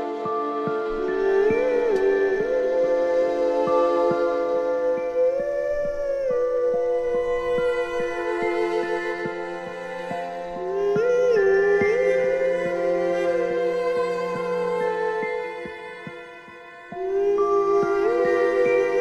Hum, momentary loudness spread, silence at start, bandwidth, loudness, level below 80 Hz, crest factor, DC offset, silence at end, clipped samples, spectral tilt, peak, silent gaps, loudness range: none; 11 LU; 0 s; 8.8 kHz; -23 LUFS; -50 dBFS; 14 dB; under 0.1%; 0 s; under 0.1%; -6 dB/octave; -10 dBFS; none; 5 LU